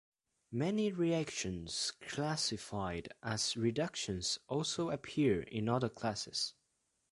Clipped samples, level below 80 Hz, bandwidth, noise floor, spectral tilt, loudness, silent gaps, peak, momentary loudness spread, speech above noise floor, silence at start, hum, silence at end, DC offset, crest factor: under 0.1%; -62 dBFS; 11.5 kHz; -81 dBFS; -4 dB/octave; -37 LUFS; none; -18 dBFS; 7 LU; 44 dB; 0.5 s; none; 0.6 s; under 0.1%; 18 dB